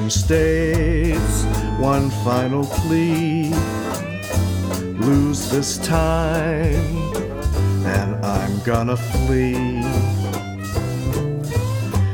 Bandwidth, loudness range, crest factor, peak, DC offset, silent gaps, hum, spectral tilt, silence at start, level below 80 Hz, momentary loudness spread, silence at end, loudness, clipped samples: 19.5 kHz; 2 LU; 14 dB; -4 dBFS; under 0.1%; none; none; -6 dB/octave; 0 s; -28 dBFS; 6 LU; 0 s; -20 LUFS; under 0.1%